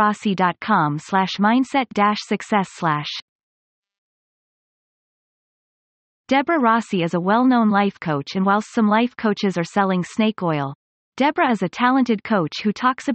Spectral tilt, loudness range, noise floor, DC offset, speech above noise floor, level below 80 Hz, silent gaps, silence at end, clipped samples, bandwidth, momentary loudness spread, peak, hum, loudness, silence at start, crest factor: -6 dB/octave; 9 LU; under -90 dBFS; under 0.1%; over 71 dB; -64 dBFS; 3.22-3.83 s, 3.98-6.24 s, 10.75-11.12 s; 0 s; under 0.1%; 8.8 kHz; 6 LU; -4 dBFS; none; -20 LUFS; 0 s; 16 dB